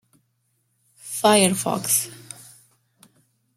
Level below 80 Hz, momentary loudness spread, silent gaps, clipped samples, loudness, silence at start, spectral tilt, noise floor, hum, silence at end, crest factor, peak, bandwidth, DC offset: -68 dBFS; 24 LU; none; under 0.1%; -20 LUFS; 1.05 s; -3 dB/octave; -70 dBFS; none; 1.4 s; 22 dB; -4 dBFS; 16.5 kHz; under 0.1%